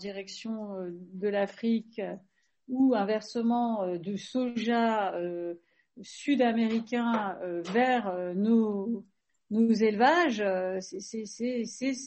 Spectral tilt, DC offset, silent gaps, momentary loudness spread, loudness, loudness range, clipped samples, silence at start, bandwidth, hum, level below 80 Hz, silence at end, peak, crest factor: -5.5 dB/octave; under 0.1%; none; 13 LU; -29 LUFS; 4 LU; under 0.1%; 0 s; 8.4 kHz; none; -76 dBFS; 0 s; -10 dBFS; 18 dB